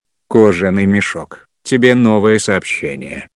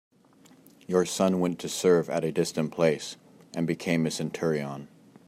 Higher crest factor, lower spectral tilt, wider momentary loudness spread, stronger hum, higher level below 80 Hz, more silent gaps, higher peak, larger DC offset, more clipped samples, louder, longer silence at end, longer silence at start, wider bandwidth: second, 14 dB vs 20 dB; about the same, -5.5 dB/octave vs -5 dB/octave; about the same, 13 LU vs 14 LU; neither; first, -50 dBFS vs -70 dBFS; neither; first, 0 dBFS vs -8 dBFS; neither; first, 0.4% vs under 0.1%; first, -13 LUFS vs -27 LUFS; second, 0.1 s vs 0.4 s; second, 0.3 s vs 0.9 s; second, 11 kHz vs 15 kHz